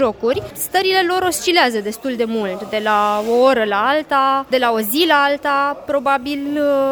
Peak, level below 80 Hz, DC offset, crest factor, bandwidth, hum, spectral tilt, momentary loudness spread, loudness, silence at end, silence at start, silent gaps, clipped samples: 0 dBFS; -54 dBFS; under 0.1%; 16 dB; over 20 kHz; none; -3 dB/octave; 7 LU; -17 LUFS; 0 s; 0 s; none; under 0.1%